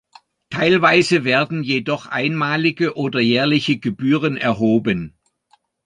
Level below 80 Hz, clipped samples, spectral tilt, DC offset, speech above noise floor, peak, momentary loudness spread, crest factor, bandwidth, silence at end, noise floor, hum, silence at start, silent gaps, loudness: -56 dBFS; under 0.1%; -6 dB/octave; under 0.1%; 43 dB; 0 dBFS; 8 LU; 18 dB; 10.5 kHz; 0.8 s; -60 dBFS; none; 0.5 s; none; -18 LUFS